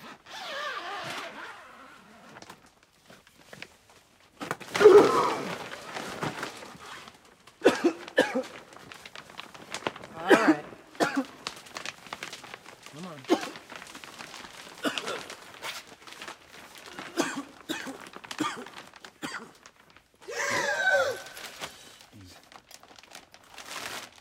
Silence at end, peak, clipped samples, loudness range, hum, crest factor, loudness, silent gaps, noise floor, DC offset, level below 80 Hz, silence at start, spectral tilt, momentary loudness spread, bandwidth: 0.1 s; -4 dBFS; under 0.1%; 14 LU; none; 26 dB; -28 LUFS; none; -59 dBFS; under 0.1%; -72 dBFS; 0 s; -3.5 dB/octave; 24 LU; 16.5 kHz